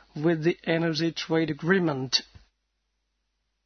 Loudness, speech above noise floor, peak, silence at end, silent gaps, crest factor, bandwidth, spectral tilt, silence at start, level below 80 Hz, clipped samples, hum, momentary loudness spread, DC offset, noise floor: -26 LUFS; 52 dB; -8 dBFS; 1.4 s; none; 20 dB; 6.6 kHz; -5 dB/octave; 0.15 s; -64 dBFS; under 0.1%; none; 3 LU; under 0.1%; -77 dBFS